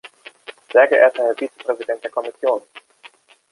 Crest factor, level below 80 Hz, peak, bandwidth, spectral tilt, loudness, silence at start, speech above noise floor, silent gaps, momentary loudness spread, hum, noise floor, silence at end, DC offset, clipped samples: 18 dB; -78 dBFS; -2 dBFS; 11.5 kHz; -3 dB/octave; -18 LUFS; 0.05 s; 30 dB; none; 20 LU; none; -48 dBFS; 0.7 s; under 0.1%; under 0.1%